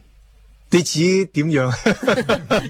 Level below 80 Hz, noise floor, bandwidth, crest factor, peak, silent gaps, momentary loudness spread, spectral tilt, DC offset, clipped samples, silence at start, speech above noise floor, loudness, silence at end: -46 dBFS; -49 dBFS; 16 kHz; 18 dB; -2 dBFS; none; 2 LU; -5 dB/octave; under 0.1%; under 0.1%; 0.7 s; 31 dB; -18 LUFS; 0 s